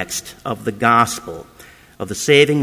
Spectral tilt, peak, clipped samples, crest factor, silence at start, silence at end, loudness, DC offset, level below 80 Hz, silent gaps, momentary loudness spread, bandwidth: -4 dB/octave; 0 dBFS; under 0.1%; 18 dB; 0 s; 0 s; -17 LUFS; under 0.1%; -50 dBFS; none; 19 LU; 16 kHz